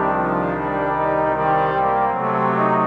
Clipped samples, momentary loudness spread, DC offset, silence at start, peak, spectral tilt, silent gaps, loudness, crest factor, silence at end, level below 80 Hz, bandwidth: under 0.1%; 3 LU; under 0.1%; 0 s; -6 dBFS; -9 dB/octave; none; -19 LUFS; 12 dB; 0 s; -44 dBFS; 5.8 kHz